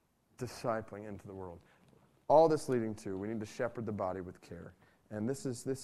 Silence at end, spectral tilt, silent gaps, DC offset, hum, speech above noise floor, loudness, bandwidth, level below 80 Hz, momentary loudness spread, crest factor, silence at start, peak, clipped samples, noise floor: 0 s; -6.5 dB/octave; none; under 0.1%; none; 31 dB; -34 LUFS; 14 kHz; -68 dBFS; 22 LU; 22 dB; 0.4 s; -14 dBFS; under 0.1%; -66 dBFS